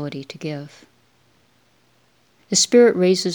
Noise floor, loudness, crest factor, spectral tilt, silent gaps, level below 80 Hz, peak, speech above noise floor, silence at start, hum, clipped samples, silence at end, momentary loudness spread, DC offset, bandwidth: -60 dBFS; -17 LUFS; 18 dB; -3.5 dB/octave; none; -74 dBFS; -2 dBFS; 42 dB; 0 s; none; under 0.1%; 0 s; 17 LU; under 0.1%; 20 kHz